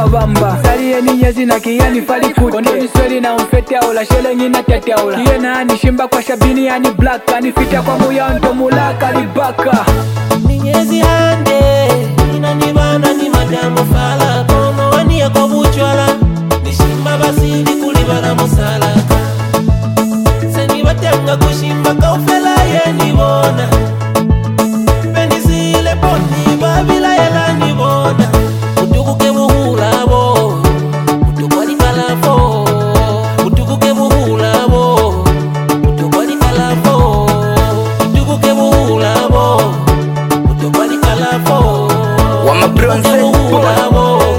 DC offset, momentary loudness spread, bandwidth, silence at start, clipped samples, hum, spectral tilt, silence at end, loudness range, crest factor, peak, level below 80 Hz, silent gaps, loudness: under 0.1%; 3 LU; 17 kHz; 0 s; under 0.1%; none; -6 dB/octave; 0 s; 1 LU; 10 dB; 0 dBFS; -20 dBFS; none; -11 LUFS